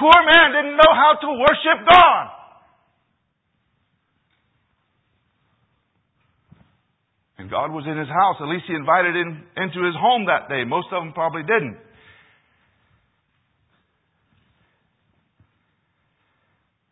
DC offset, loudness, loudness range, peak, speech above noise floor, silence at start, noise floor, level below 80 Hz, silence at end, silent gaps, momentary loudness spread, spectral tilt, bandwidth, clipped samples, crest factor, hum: under 0.1%; -16 LUFS; 14 LU; 0 dBFS; 54 dB; 0 s; -71 dBFS; -52 dBFS; 5.15 s; none; 17 LU; -6 dB/octave; 8 kHz; under 0.1%; 20 dB; none